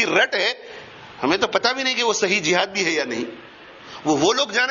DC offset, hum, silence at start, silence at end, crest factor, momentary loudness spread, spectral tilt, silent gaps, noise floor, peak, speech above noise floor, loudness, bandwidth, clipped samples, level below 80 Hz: under 0.1%; none; 0 s; 0 s; 20 dB; 20 LU; -2.5 dB/octave; none; -41 dBFS; -2 dBFS; 21 dB; -20 LUFS; 7.4 kHz; under 0.1%; -62 dBFS